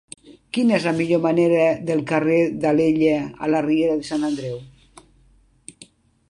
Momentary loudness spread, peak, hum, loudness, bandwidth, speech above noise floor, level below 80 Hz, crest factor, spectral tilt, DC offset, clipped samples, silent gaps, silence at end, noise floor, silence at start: 7 LU; -4 dBFS; none; -20 LUFS; 11 kHz; 37 dB; -56 dBFS; 16 dB; -6.5 dB/octave; under 0.1%; under 0.1%; none; 1.6 s; -56 dBFS; 0.3 s